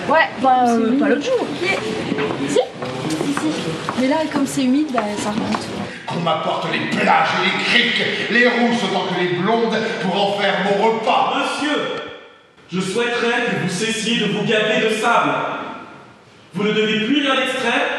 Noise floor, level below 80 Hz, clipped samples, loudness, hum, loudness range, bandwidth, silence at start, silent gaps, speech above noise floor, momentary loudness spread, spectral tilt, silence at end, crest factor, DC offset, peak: -45 dBFS; -60 dBFS; under 0.1%; -18 LUFS; none; 4 LU; 13 kHz; 0 s; none; 27 dB; 8 LU; -4.5 dB/octave; 0 s; 18 dB; under 0.1%; -2 dBFS